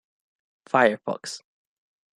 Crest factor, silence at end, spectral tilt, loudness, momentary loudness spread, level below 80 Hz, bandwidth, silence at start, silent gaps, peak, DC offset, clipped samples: 24 dB; 0.8 s; -4 dB/octave; -23 LUFS; 16 LU; -74 dBFS; 12.5 kHz; 0.75 s; none; -4 dBFS; under 0.1%; under 0.1%